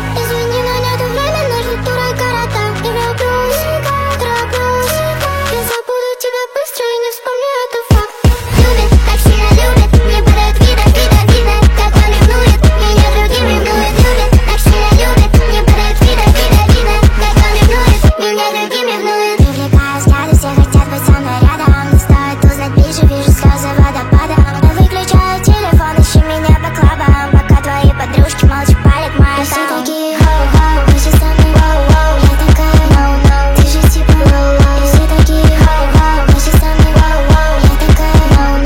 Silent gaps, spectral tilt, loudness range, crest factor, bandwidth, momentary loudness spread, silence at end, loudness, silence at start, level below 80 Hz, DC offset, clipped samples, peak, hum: none; -5.5 dB/octave; 5 LU; 8 dB; 17 kHz; 6 LU; 0 s; -10 LUFS; 0 s; -10 dBFS; under 0.1%; under 0.1%; 0 dBFS; none